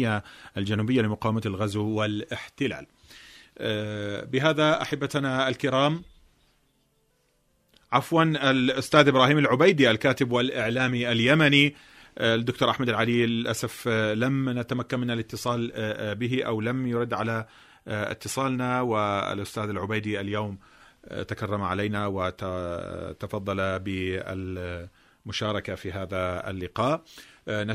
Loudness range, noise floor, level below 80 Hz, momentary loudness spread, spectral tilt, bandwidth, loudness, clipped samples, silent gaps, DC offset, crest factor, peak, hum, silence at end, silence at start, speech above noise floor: 10 LU; -69 dBFS; -58 dBFS; 14 LU; -5.5 dB/octave; 15 kHz; -26 LUFS; under 0.1%; none; under 0.1%; 22 dB; -4 dBFS; none; 0 s; 0 s; 43 dB